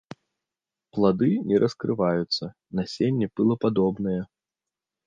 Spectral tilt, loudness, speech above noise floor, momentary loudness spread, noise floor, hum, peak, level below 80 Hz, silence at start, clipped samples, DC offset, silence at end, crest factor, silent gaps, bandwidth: -7.5 dB/octave; -25 LUFS; 65 dB; 10 LU; -89 dBFS; none; -8 dBFS; -58 dBFS; 0.95 s; under 0.1%; under 0.1%; 0.8 s; 18 dB; none; 7.6 kHz